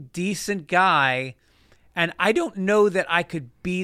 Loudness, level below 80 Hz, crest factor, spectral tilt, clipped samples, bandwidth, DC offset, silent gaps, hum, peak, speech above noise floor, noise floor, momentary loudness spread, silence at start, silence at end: -22 LUFS; -58 dBFS; 18 dB; -4.5 dB/octave; under 0.1%; 15 kHz; under 0.1%; none; none; -4 dBFS; 35 dB; -57 dBFS; 13 LU; 0 s; 0 s